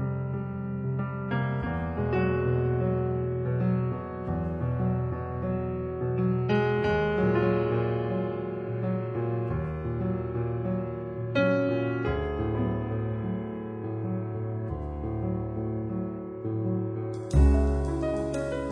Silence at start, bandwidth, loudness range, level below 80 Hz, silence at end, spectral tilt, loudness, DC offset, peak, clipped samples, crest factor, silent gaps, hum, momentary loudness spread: 0 s; 9.8 kHz; 5 LU; -36 dBFS; 0 s; -9 dB/octave; -29 LUFS; under 0.1%; -10 dBFS; under 0.1%; 18 dB; none; none; 8 LU